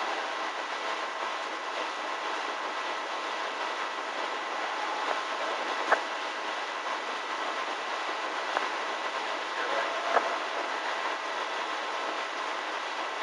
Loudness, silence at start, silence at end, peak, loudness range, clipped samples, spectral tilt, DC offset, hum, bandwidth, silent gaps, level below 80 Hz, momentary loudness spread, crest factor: -32 LUFS; 0 s; 0 s; -10 dBFS; 2 LU; under 0.1%; 0 dB/octave; under 0.1%; none; 11.5 kHz; none; under -90 dBFS; 5 LU; 22 dB